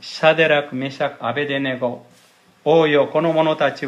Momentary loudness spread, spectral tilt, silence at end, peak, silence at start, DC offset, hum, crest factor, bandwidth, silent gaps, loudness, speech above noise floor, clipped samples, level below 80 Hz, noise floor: 11 LU; -6 dB/octave; 0 s; 0 dBFS; 0 s; under 0.1%; none; 18 dB; 10.5 kHz; none; -18 LUFS; 35 dB; under 0.1%; -72 dBFS; -53 dBFS